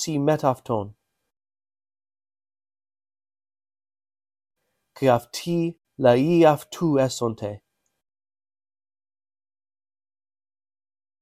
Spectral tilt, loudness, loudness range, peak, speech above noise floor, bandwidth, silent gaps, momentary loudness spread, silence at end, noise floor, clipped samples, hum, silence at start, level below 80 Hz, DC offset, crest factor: -6 dB/octave; -22 LUFS; 14 LU; -4 dBFS; over 69 dB; 15.5 kHz; none; 13 LU; 3.65 s; under -90 dBFS; under 0.1%; none; 0 s; -62 dBFS; under 0.1%; 22 dB